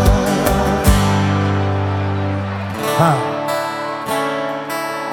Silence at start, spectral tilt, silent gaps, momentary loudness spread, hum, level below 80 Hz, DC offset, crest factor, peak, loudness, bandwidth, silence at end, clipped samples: 0 s; -5.5 dB/octave; none; 8 LU; none; -26 dBFS; under 0.1%; 16 dB; 0 dBFS; -18 LUFS; 18.5 kHz; 0 s; under 0.1%